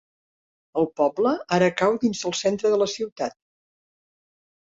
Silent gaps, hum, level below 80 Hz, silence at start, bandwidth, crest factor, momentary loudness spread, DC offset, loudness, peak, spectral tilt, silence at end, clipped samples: 3.12-3.16 s; none; -64 dBFS; 0.75 s; 8 kHz; 18 dB; 9 LU; under 0.1%; -23 LUFS; -6 dBFS; -4.5 dB/octave; 1.45 s; under 0.1%